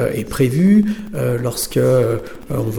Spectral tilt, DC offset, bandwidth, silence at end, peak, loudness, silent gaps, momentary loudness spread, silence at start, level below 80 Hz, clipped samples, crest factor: -6.5 dB/octave; under 0.1%; 19.5 kHz; 0 s; -4 dBFS; -17 LUFS; none; 10 LU; 0 s; -40 dBFS; under 0.1%; 12 dB